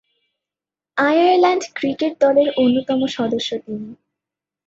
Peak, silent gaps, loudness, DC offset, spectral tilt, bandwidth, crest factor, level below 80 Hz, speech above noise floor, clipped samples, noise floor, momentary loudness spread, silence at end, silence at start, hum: -4 dBFS; none; -18 LUFS; under 0.1%; -4.5 dB/octave; 7.8 kHz; 16 dB; -64 dBFS; 72 dB; under 0.1%; -89 dBFS; 13 LU; 0.75 s; 0.95 s; none